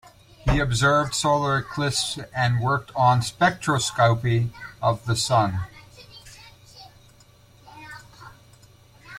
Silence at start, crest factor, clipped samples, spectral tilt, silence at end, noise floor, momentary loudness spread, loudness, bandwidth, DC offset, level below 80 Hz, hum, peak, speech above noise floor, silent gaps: 0.45 s; 20 dB; under 0.1%; -4.5 dB/octave; 0 s; -53 dBFS; 22 LU; -22 LUFS; 14.5 kHz; under 0.1%; -42 dBFS; none; -6 dBFS; 31 dB; none